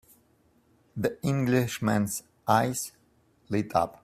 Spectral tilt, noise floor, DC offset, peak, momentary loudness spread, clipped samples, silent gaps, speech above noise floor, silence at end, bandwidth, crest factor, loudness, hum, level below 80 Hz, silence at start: -5.5 dB/octave; -65 dBFS; under 0.1%; -8 dBFS; 9 LU; under 0.1%; none; 38 dB; 0.1 s; 16 kHz; 22 dB; -28 LUFS; none; -62 dBFS; 0.95 s